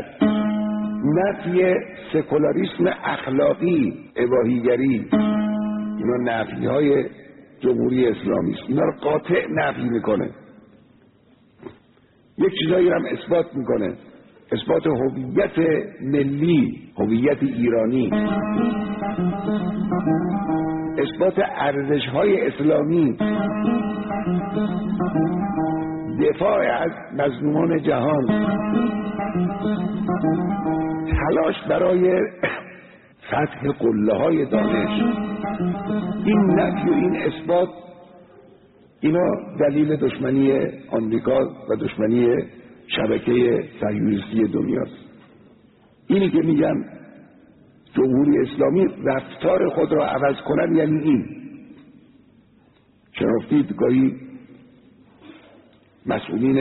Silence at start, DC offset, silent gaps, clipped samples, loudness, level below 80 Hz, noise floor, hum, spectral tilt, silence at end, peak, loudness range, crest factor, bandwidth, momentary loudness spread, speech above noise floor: 0 s; under 0.1%; none; under 0.1%; -21 LUFS; -48 dBFS; -56 dBFS; none; -6 dB/octave; 0 s; -6 dBFS; 3 LU; 14 dB; 4.1 kHz; 7 LU; 36 dB